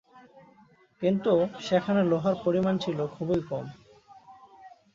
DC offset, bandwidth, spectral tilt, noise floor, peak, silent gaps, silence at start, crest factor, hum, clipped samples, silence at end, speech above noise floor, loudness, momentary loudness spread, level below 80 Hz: under 0.1%; 7.4 kHz; -7.5 dB/octave; -59 dBFS; -10 dBFS; none; 0.15 s; 18 dB; none; under 0.1%; 0.25 s; 33 dB; -27 LUFS; 8 LU; -64 dBFS